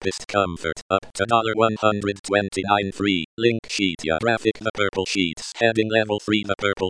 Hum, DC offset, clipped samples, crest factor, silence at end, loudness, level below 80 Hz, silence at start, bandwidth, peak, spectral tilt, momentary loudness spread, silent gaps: none; under 0.1%; under 0.1%; 20 dB; 0 s; -22 LUFS; -52 dBFS; 0 s; 10.5 kHz; -4 dBFS; -4.5 dB/octave; 5 LU; 0.82-0.89 s, 2.19-2.24 s, 3.25-3.37 s, 3.59-3.63 s, 4.70-4.74 s